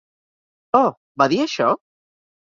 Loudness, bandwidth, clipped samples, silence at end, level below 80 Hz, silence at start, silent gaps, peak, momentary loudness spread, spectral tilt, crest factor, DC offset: -20 LUFS; 7.6 kHz; under 0.1%; 0.7 s; -64 dBFS; 0.75 s; 0.97-1.15 s; -2 dBFS; 4 LU; -5 dB/octave; 20 dB; under 0.1%